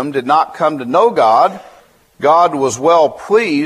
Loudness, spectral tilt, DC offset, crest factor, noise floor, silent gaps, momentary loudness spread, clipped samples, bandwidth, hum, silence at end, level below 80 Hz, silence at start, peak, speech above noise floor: -13 LUFS; -4.5 dB/octave; under 0.1%; 12 dB; -46 dBFS; none; 6 LU; under 0.1%; 13.5 kHz; none; 0 s; -60 dBFS; 0 s; 0 dBFS; 34 dB